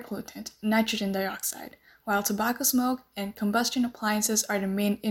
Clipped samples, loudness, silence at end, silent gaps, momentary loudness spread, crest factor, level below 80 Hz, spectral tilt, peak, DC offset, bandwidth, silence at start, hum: under 0.1%; -27 LUFS; 0 s; none; 13 LU; 16 dB; -62 dBFS; -3.5 dB/octave; -12 dBFS; under 0.1%; 17 kHz; 0 s; none